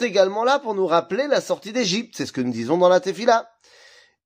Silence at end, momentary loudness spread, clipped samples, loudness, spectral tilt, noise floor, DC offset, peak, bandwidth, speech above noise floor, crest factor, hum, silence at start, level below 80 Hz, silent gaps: 0.8 s; 8 LU; under 0.1%; -21 LUFS; -4 dB/octave; -52 dBFS; under 0.1%; -4 dBFS; 15.5 kHz; 31 dB; 18 dB; none; 0 s; -72 dBFS; none